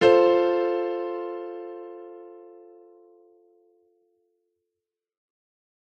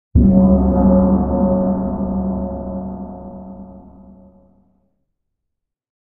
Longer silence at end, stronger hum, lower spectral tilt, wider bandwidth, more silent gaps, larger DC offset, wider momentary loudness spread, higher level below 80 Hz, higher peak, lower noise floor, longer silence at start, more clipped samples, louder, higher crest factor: first, 3.5 s vs 2.2 s; neither; second, -6 dB/octave vs -15 dB/octave; first, 8.4 kHz vs 1.8 kHz; neither; neither; first, 26 LU vs 21 LU; second, -70 dBFS vs -26 dBFS; second, -6 dBFS vs -2 dBFS; first, -87 dBFS vs -78 dBFS; second, 0 s vs 0.15 s; neither; second, -24 LUFS vs -16 LUFS; first, 22 dB vs 16 dB